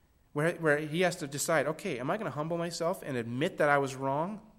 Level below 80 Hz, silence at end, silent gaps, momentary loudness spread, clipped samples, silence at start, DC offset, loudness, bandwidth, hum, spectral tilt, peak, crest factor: -66 dBFS; 0.15 s; none; 7 LU; under 0.1%; 0.35 s; under 0.1%; -31 LUFS; 16 kHz; none; -5 dB/octave; -10 dBFS; 20 dB